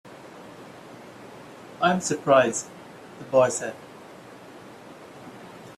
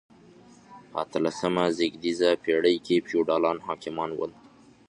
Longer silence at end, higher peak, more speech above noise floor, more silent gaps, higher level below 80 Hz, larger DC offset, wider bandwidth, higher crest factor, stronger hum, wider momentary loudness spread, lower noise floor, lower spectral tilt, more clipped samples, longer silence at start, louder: second, 0.05 s vs 0.6 s; about the same, -6 dBFS vs -8 dBFS; second, 23 dB vs 27 dB; neither; about the same, -68 dBFS vs -66 dBFS; neither; first, 14 kHz vs 10.5 kHz; about the same, 22 dB vs 18 dB; neither; first, 25 LU vs 10 LU; second, -45 dBFS vs -53 dBFS; about the same, -4 dB/octave vs -5 dB/octave; neither; second, 0.05 s vs 0.7 s; first, -23 LUFS vs -26 LUFS